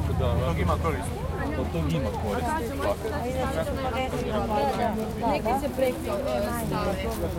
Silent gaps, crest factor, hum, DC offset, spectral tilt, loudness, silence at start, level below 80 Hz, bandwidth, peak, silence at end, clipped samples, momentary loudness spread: none; 14 dB; none; under 0.1%; -6.5 dB/octave; -27 LUFS; 0 s; -38 dBFS; 17 kHz; -12 dBFS; 0 s; under 0.1%; 4 LU